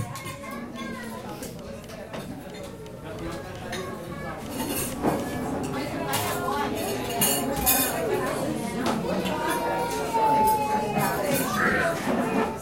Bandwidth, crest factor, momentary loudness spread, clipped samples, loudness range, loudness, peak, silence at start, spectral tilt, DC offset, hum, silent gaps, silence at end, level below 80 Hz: 17 kHz; 20 dB; 14 LU; under 0.1%; 12 LU; -27 LUFS; -6 dBFS; 0 s; -4 dB/octave; 0.1%; none; none; 0 s; -48 dBFS